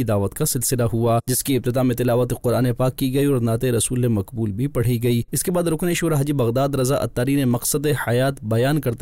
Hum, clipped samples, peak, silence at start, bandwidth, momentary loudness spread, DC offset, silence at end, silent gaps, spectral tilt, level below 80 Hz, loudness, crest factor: none; under 0.1%; -12 dBFS; 0 s; 16 kHz; 2 LU; 0.4%; 0 s; none; -5.5 dB/octave; -42 dBFS; -20 LUFS; 8 dB